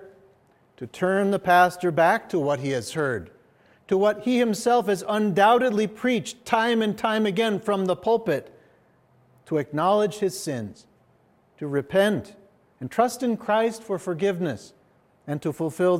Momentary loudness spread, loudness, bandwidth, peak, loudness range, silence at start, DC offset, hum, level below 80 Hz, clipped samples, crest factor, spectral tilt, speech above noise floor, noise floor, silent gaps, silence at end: 11 LU; -24 LUFS; 16 kHz; -6 dBFS; 5 LU; 0 s; under 0.1%; none; -68 dBFS; under 0.1%; 18 dB; -5.5 dB/octave; 38 dB; -61 dBFS; none; 0 s